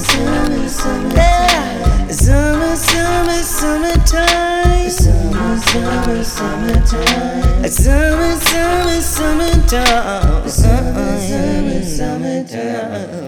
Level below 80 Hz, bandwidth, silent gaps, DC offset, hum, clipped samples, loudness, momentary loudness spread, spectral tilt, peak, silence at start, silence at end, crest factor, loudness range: -16 dBFS; 18 kHz; none; under 0.1%; none; under 0.1%; -14 LUFS; 7 LU; -4.5 dB/octave; 0 dBFS; 0 s; 0 s; 12 dB; 2 LU